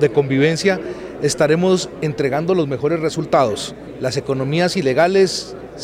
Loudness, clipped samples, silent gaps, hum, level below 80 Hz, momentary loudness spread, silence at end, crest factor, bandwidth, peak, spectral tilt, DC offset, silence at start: -18 LUFS; under 0.1%; none; none; -50 dBFS; 10 LU; 0 s; 16 dB; 15 kHz; -2 dBFS; -5 dB/octave; under 0.1%; 0 s